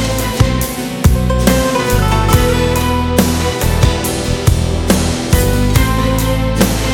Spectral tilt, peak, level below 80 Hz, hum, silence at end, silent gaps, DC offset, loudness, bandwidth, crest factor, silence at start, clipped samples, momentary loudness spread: -5 dB/octave; 0 dBFS; -18 dBFS; none; 0 s; none; under 0.1%; -14 LUFS; 18.5 kHz; 12 dB; 0 s; under 0.1%; 3 LU